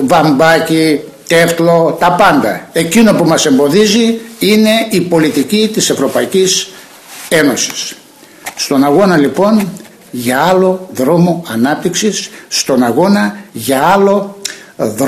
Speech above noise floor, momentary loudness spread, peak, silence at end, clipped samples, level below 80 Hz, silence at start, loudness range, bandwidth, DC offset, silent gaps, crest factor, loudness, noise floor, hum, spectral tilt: 25 dB; 11 LU; 0 dBFS; 0 s; under 0.1%; -48 dBFS; 0 s; 3 LU; 16 kHz; under 0.1%; none; 10 dB; -11 LUFS; -35 dBFS; none; -4.5 dB/octave